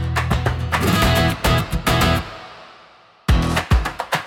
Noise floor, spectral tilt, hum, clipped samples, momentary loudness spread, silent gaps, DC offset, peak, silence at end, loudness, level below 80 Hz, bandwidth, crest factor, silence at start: -48 dBFS; -5 dB/octave; none; under 0.1%; 9 LU; none; under 0.1%; -4 dBFS; 0 s; -19 LUFS; -26 dBFS; 18 kHz; 14 dB; 0 s